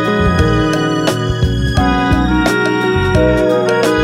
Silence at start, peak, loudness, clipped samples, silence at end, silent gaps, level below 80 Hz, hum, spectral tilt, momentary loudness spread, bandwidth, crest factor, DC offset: 0 s; 0 dBFS; -13 LUFS; under 0.1%; 0 s; none; -22 dBFS; none; -6 dB/octave; 3 LU; 16 kHz; 12 dB; under 0.1%